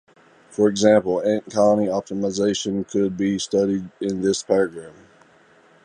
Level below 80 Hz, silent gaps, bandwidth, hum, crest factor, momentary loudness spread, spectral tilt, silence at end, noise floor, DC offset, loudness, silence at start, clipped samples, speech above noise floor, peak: -58 dBFS; none; 11 kHz; none; 18 dB; 9 LU; -5 dB/octave; 0.95 s; -54 dBFS; under 0.1%; -21 LUFS; 0.5 s; under 0.1%; 33 dB; -2 dBFS